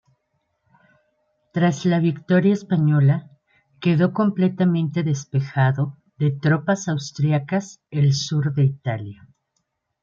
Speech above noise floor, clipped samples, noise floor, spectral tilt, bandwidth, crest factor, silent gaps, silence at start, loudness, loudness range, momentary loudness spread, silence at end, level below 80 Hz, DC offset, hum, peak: 55 dB; under 0.1%; -74 dBFS; -7 dB/octave; 7.4 kHz; 16 dB; none; 1.55 s; -21 LUFS; 3 LU; 8 LU; 0.9 s; -64 dBFS; under 0.1%; none; -6 dBFS